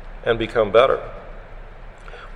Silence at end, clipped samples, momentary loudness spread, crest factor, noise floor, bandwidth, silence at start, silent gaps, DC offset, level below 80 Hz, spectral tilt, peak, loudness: 0 s; under 0.1%; 25 LU; 22 dB; -38 dBFS; 9.4 kHz; 0 s; none; under 0.1%; -38 dBFS; -6 dB/octave; 0 dBFS; -19 LUFS